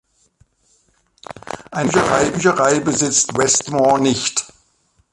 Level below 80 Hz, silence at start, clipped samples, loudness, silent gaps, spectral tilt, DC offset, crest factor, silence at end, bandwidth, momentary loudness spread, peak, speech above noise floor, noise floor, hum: -50 dBFS; 1.3 s; under 0.1%; -16 LUFS; none; -3 dB/octave; under 0.1%; 18 dB; 0.7 s; 11.5 kHz; 17 LU; 0 dBFS; 45 dB; -61 dBFS; none